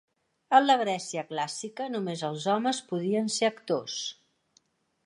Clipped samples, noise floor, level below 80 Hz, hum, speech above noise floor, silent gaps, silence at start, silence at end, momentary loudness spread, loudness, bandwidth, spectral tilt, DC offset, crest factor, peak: under 0.1%; -69 dBFS; -84 dBFS; none; 41 dB; none; 0.5 s; 0.95 s; 11 LU; -28 LUFS; 11.5 kHz; -3.5 dB/octave; under 0.1%; 22 dB; -6 dBFS